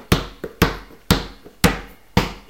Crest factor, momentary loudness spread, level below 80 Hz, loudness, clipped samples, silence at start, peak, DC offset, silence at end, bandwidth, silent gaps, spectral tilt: 22 dB; 14 LU; -32 dBFS; -21 LUFS; under 0.1%; 0 s; 0 dBFS; 0.2%; 0.1 s; 17 kHz; none; -4.5 dB/octave